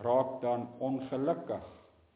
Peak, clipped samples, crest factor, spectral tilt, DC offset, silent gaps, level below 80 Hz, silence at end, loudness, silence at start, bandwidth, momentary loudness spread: -16 dBFS; under 0.1%; 16 dB; -7 dB/octave; under 0.1%; none; -68 dBFS; 0.4 s; -34 LUFS; 0 s; 4 kHz; 11 LU